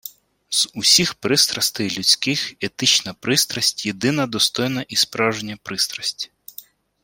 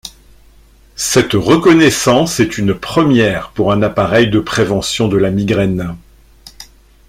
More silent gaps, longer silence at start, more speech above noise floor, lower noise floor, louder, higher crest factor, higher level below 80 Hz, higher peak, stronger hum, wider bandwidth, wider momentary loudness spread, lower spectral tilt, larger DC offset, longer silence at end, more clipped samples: neither; about the same, 0.05 s vs 0.05 s; second, 23 dB vs 32 dB; about the same, -44 dBFS vs -44 dBFS; second, -18 LUFS vs -13 LUFS; first, 20 dB vs 14 dB; second, -60 dBFS vs -40 dBFS; about the same, -2 dBFS vs 0 dBFS; neither; about the same, 16.5 kHz vs 16 kHz; about the same, 12 LU vs 10 LU; second, -2 dB/octave vs -5 dB/octave; neither; about the same, 0.4 s vs 0.45 s; neither